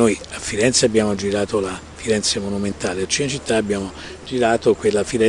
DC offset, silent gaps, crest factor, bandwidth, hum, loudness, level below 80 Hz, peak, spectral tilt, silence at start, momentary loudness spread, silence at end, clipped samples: under 0.1%; none; 18 dB; 11 kHz; none; -20 LUFS; -46 dBFS; -2 dBFS; -3.5 dB/octave; 0 s; 10 LU; 0 s; under 0.1%